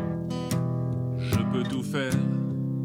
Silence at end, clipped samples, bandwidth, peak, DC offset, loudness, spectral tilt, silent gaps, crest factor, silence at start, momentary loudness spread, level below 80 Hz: 0 s; under 0.1%; 16.5 kHz; -12 dBFS; under 0.1%; -28 LUFS; -7 dB/octave; none; 14 dB; 0 s; 3 LU; -52 dBFS